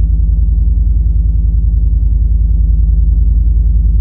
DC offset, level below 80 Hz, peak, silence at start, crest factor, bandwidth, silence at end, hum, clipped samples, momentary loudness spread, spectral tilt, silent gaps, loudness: under 0.1%; -10 dBFS; -2 dBFS; 0 s; 6 dB; 0.7 kHz; 0 s; none; under 0.1%; 1 LU; -14 dB/octave; none; -13 LUFS